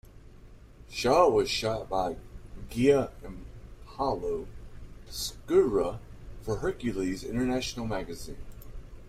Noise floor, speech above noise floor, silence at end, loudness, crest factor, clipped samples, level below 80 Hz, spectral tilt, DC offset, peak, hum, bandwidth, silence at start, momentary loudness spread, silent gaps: -50 dBFS; 22 dB; 0 s; -29 LUFS; 22 dB; under 0.1%; -46 dBFS; -5 dB/octave; under 0.1%; -8 dBFS; none; 16 kHz; 0.15 s; 24 LU; none